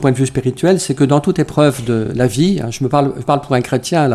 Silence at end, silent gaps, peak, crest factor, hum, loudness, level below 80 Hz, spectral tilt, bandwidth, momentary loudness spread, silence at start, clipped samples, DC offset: 0 s; none; 0 dBFS; 14 dB; none; -15 LUFS; -44 dBFS; -6 dB/octave; 14 kHz; 4 LU; 0 s; under 0.1%; under 0.1%